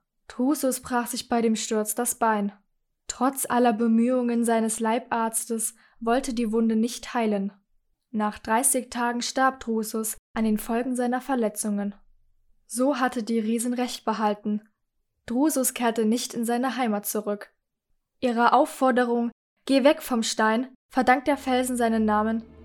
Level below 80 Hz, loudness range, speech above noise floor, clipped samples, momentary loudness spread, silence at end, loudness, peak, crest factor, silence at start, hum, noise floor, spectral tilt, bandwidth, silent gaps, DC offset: -56 dBFS; 4 LU; 51 dB; under 0.1%; 8 LU; 0 s; -25 LUFS; -6 dBFS; 20 dB; 0.3 s; none; -75 dBFS; -3.5 dB/octave; 18 kHz; 10.19-10.34 s, 19.32-19.56 s, 20.75-20.89 s; under 0.1%